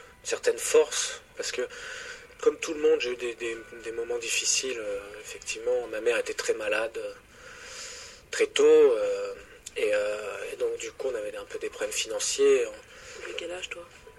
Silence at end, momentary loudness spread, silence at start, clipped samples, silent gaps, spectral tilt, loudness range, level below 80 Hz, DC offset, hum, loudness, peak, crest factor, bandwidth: 0.1 s; 17 LU; 0 s; under 0.1%; none; -1 dB/octave; 5 LU; -62 dBFS; under 0.1%; none; -28 LUFS; -8 dBFS; 20 dB; 13.5 kHz